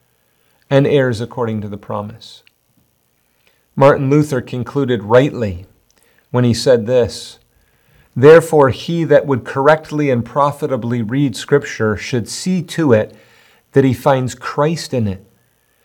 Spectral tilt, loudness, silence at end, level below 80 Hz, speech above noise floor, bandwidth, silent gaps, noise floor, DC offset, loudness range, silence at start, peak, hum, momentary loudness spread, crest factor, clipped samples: -6.5 dB/octave; -15 LUFS; 0.7 s; -52 dBFS; 47 dB; 17.5 kHz; none; -61 dBFS; under 0.1%; 5 LU; 0.7 s; 0 dBFS; none; 13 LU; 16 dB; 0.2%